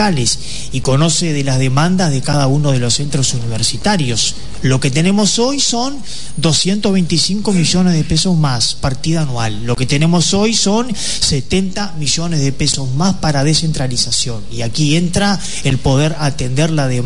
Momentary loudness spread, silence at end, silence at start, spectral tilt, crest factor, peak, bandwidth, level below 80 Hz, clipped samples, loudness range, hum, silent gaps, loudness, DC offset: 6 LU; 0 s; 0 s; -4.5 dB/octave; 14 dB; 0 dBFS; 11 kHz; -34 dBFS; under 0.1%; 1 LU; none; none; -14 LUFS; 9%